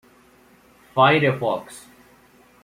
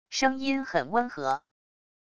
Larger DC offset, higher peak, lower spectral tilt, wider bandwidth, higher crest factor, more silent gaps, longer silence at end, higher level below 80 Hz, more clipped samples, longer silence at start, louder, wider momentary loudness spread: neither; first, -4 dBFS vs -10 dBFS; first, -6 dB/octave vs -3.5 dB/octave; first, 16 kHz vs 10 kHz; about the same, 20 dB vs 20 dB; neither; first, 0.85 s vs 0.65 s; about the same, -62 dBFS vs -64 dBFS; neither; first, 0.95 s vs 0.05 s; first, -20 LUFS vs -28 LUFS; first, 24 LU vs 5 LU